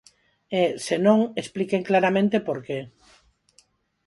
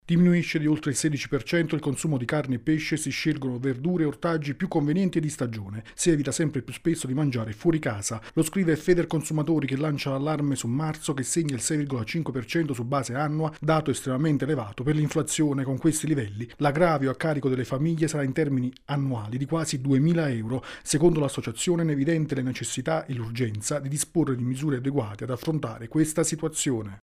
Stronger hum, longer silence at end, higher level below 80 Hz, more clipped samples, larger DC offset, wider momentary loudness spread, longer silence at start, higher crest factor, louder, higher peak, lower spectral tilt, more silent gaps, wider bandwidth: neither; first, 1.2 s vs 0.05 s; second, -66 dBFS vs -52 dBFS; neither; neither; first, 10 LU vs 6 LU; first, 0.5 s vs 0.05 s; about the same, 20 dB vs 18 dB; first, -23 LUFS vs -26 LUFS; first, -4 dBFS vs -8 dBFS; about the same, -6 dB/octave vs -5.5 dB/octave; neither; second, 11.5 kHz vs 15 kHz